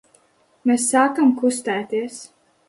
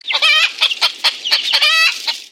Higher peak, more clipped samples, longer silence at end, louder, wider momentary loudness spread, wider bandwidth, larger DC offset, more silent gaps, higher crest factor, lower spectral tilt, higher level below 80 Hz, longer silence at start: about the same, -4 dBFS vs -2 dBFS; neither; first, 0.4 s vs 0.05 s; second, -19 LUFS vs -12 LUFS; first, 11 LU vs 5 LU; second, 11.5 kHz vs 16.5 kHz; neither; neither; about the same, 16 dB vs 14 dB; first, -3.5 dB/octave vs 4 dB/octave; first, -70 dBFS vs -76 dBFS; first, 0.65 s vs 0.05 s